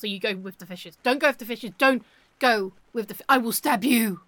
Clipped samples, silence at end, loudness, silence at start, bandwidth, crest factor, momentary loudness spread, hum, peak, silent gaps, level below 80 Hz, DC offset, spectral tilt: under 0.1%; 0.1 s; -24 LUFS; 0 s; 17.5 kHz; 18 dB; 13 LU; none; -6 dBFS; none; -70 dBFS; under 0.1%; -3.5 dB/octave